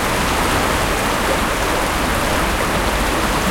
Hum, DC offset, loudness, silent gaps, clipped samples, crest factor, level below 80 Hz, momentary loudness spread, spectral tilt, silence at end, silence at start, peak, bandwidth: none; under 0.1%; -17 LUFS; none; under 0.1%; 14 dB; -26 dBFS; 1 LU; -3.5 dB/octave; 0 s; 0 s; -4 dBFS; 17 kHz